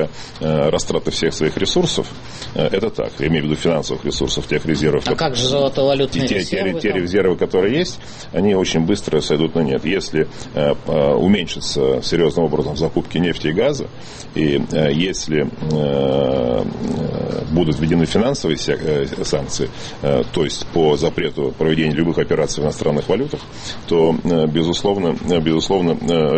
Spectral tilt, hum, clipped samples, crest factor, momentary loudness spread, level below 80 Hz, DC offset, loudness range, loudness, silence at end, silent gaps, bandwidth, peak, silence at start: -5.5 dB/octave; none; under 0.1%; 14 dB; 6 LU; -38 dBFS; under 0.1%; 2 LU; -18 LUFS; 0 s; none; 8.8 kHz; -4 dBFS; 0 s